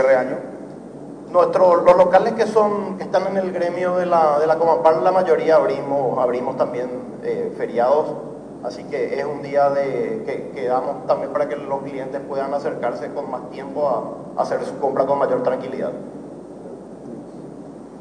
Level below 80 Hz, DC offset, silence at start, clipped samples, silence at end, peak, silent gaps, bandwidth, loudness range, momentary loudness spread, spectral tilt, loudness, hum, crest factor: -58 dBFS; under 0.1%; 0 s; under 0.1%; 0 s; -2 dBFS; none; 10 kHz; 7 LU; 20 LU; -6.5 dB/octave; -20 LUFS; none; 18 dB